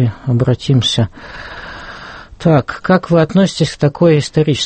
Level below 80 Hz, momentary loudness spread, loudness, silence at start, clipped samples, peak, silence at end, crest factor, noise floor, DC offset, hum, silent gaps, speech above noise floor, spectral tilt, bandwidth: -40 dBFS; 18 LU; -14 LUFS; 0 s; under 0.1%; 0 dBFS; 0 s; 14 dB; -33 dBFS; under 0.1%; none; none; 19 dB; -6 dB/octave; 8.8 kHz